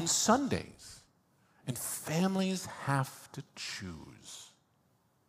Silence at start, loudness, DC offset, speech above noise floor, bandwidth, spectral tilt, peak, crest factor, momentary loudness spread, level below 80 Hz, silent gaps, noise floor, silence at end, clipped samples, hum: 0 s; -33 LUFS; under 0.1%; 38 dB; 15.5 kHz; -4 dB/octave; -14 dBFS; 22 dB; 20 LU; -68 dBFS; none; -72 dBFS; 0.8 s; under 0.1%; none